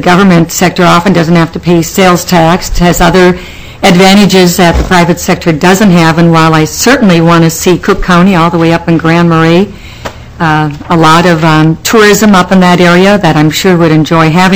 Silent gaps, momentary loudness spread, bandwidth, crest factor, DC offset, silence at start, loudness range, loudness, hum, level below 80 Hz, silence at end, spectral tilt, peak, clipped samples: none; 5 LU; 16 kHz; 6 dB; 1%; 0 s; 2 LU; -5 LUFS; none; -24 dBFS; 0 s; -5.5 dB/octave; 0 dBFS; 20%